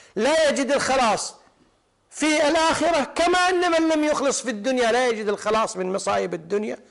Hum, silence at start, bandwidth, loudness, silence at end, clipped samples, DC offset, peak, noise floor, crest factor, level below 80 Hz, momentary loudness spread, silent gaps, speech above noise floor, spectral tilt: none; 0.15 s; 11.5 kHz; -21 LUFS; 0.15 s; under 0.1%; under 0.1%; -12 dBFS; -62 dBFS; 10 dB; -54 dBFS; 7 LU; none; 41 dB; -3 dB/octave